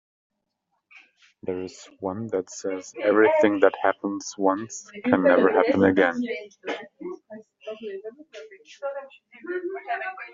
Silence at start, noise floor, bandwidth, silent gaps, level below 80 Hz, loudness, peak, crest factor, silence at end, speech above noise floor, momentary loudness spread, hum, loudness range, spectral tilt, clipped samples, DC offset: 0.95 s; -77 dBFS; 7.6 kHz; none; -68 dBFS; -24 LUFS; -2 dBFS; 24 dB; 0 s; 53 dB; 20 LU; none; 14 LU; -4.5 dB/octave; under 0.1%; under 0.1%